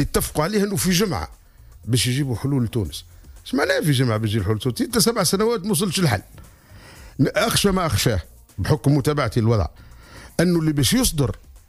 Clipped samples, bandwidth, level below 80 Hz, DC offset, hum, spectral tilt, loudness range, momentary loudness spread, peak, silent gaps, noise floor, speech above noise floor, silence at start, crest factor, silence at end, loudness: under 0.1%; 15.5 kHz; -38 dBFS; under 0.1%; none; -5 dB/octave; 2 LU; 11 LU; -6 dBFS; none; -45 dBFS; 25 dB; 0 s; 14 dB; 0.1 s; -21 LUFS